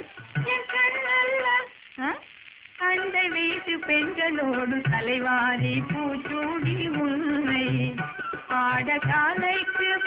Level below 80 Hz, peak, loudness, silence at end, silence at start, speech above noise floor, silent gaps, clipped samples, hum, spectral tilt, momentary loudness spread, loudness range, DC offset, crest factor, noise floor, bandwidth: -60 dBFS; -12 dBFS; -25 LUFS; 0 s; 0 s; 23 dB; none; under 0.1%; none; -3 dB/octave; 9 LU; 2 LU; under 0.1%; 14 dB; -49 dBFS; 4 kHz